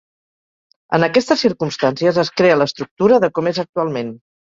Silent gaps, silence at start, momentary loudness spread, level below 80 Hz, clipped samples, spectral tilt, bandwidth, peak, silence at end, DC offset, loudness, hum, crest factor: 2.91-2.97 s, 3.69-3.73 s; 0.9 s; 7 LU; -58 dBFS; under 0.1%; -5.5 dB/octave; 7.8 kHz; -2 dBFS; 0.35 s; under 0.1%; -17 LUFS; none; 16 dB